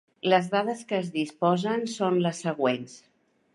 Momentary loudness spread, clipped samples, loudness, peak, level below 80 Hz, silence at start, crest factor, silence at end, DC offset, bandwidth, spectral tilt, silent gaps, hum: 7 LU; under 0.1%; -27 LUFS; -8 dBFS; -76 dBFS; 0.25 s; 18 dB; 0.55 s; under 0.1%; 11.5 kHz; -5.5 dB/octave; none; none